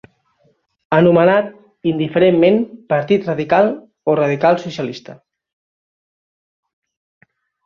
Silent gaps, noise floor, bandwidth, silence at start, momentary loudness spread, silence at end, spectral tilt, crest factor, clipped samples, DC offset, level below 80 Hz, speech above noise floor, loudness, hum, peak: none; -60 dBFS; 7 kHz; 0.9 s; 13 LU; 2.5 s; -8 dB/octave; 16 dB; under 0.1%; under 0.1%; -58 dBFS; 46 dB; -16 LUFS; none; -2 dBFS